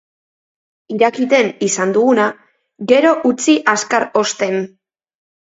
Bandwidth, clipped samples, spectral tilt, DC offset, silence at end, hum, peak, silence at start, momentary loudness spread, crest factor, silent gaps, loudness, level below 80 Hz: 8 kHz; under 0.1%; -3.5 dB/octave; under 0.1%; 0.75 s; none; 0 dBFS; 0.9 s; 8 LU; 16 dB; none; -15 LUFS; -66 dBFS